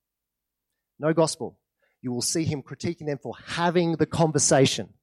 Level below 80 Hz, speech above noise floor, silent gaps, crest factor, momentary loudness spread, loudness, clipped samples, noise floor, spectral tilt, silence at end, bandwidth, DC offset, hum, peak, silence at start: -60 dBFS; 61 dB; none; 18 dB; 14 LU; -25 LUFS; under 0.1%; -85 dBFS; -4.5 dB/octave; 0.15 s; 14 kHz; under 0.1%; none; -8 dBFS; 1 s